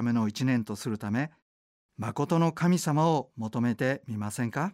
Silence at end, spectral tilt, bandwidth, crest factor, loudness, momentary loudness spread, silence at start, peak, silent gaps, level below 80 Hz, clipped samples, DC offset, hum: 0 s; -6.5 dB/octave; 15.5 kHz; 14 dB; -29 LUFS; 10 LU; 0 s; -14 dBFS; 1.42-1.89 s; -68 dBFS; under 0.1%; under 0.1%; none